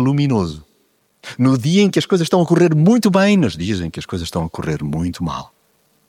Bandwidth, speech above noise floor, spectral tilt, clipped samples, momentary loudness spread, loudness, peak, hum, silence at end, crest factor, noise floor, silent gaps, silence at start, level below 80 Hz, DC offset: 16.5 kHz; 45 dB; -6.5 dB/octave; under 0.1%; 12 LU; -17 LUFS; -2 dBFS; none; 0.65 s; 16 dB; -61 dBFS; none; 0 s; -44 dBFS; under 0.1%